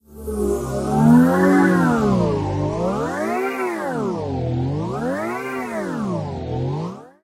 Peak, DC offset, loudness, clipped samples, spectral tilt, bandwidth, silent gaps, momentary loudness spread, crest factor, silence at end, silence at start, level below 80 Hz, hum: -2 dBFS; under 0.1%; -20 LUFS; under 0.1%; -7.5 dB/octave; 15.5 kHz; none; 11 LU; 18 dB; 0.15 s; 0.1 s; -40 dBFS; none